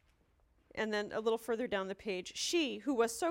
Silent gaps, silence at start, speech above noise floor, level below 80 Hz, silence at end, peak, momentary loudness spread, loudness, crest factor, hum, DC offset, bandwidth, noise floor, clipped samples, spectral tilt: none; 0.75 s; 36 dB; -70 dBFS; 0 s; -20 dBFS; 7 LU; -36 LUFS; 18 dB; none; under 0.1%; 16.5 kHz; -71 dBFS; under 0.1%; -3 dB/octave